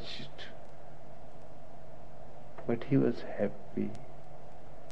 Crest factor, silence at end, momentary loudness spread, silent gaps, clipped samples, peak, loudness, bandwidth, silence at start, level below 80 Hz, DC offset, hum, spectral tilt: 22 dB; 0 s; 23 LU; none; under 0.1%; -16 dBFS; -35 LUFS; 9.6 kHz; 0 s; -60 dBFS; 2%; none; -8 dB/octave